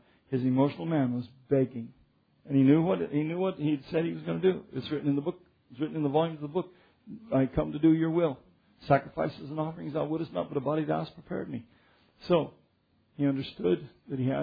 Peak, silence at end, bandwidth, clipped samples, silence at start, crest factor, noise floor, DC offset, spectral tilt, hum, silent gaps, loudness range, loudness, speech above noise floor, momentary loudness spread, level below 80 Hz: -10 dBFS; 0 s; 5 kHz; under 0.1%; 0.3 s; 20 dB; -69 dBFS; under 0.1%; -10.5 dB/octave; none; none; 5 LU; -30 LUFS; 41 dB; 12 LU; -58 dBFS